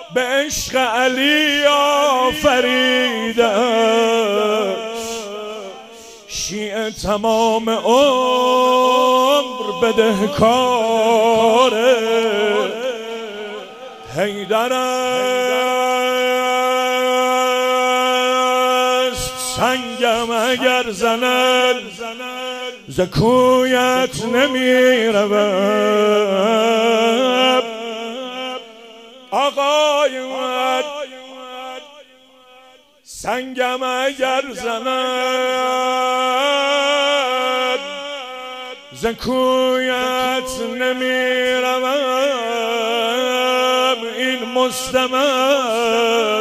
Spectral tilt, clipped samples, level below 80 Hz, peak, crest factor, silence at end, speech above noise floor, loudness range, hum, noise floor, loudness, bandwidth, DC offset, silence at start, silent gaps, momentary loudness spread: -3 dB/octave; under 0.1%; -50 dBFS; 0 dBFS; 16 dB; 0 s; 32 dB; 6 LU; none; -48 dBFS; -16 LUFS; 16 kHz; under 0.1%; 0 s; none; 13 LU